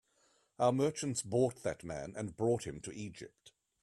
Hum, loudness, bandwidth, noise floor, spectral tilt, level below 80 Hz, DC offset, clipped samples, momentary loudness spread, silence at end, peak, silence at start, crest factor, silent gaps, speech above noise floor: none; -36 LUFS; 14 kHz; -73 dBFS; -5.5 dB/octave; -66 dBFS; under 0.1%; under 0.1%; 14 LU; 0.35 s; -16 dBFS; 0.6 s; 20 dB; none; 38 dB